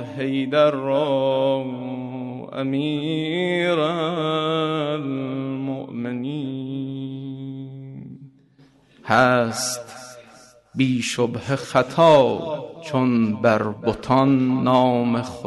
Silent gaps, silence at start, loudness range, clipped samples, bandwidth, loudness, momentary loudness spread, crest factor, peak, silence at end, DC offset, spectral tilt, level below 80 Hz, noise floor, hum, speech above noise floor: none; 0 s; 9 LU; under 0.1%; 12 kHz; -21 LUFS; 15 LU; 18 dB; -4 dBFS; 0 s; under 0.1%; -5.5 dB/octave; -58 dBFS; -54 dBFS; none; 34 dB